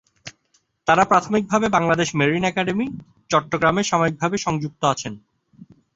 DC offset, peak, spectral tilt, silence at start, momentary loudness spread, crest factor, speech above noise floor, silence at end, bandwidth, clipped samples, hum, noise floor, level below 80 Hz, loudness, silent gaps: under 0.1%; -2 dBFS; -5 dB/octave; 0.25 s; 13 LU; 20 dB; 46 dB; 0.3 s; 8 kHz; under 0.1%; none; -66 dBFS; -54 dBFS; -20 LUFS; none